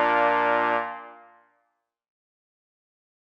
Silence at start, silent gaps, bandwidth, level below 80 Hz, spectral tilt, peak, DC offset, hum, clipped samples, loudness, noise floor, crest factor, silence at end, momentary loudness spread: 0 s; none; 7 kHz; -78 dBFS; -5.5 dB/octave; -8 dBFS; under 0.1%; none; under 0.1%; -23 LUFS; -76 dBFS; 20 dB; 2.1 s; 15 LU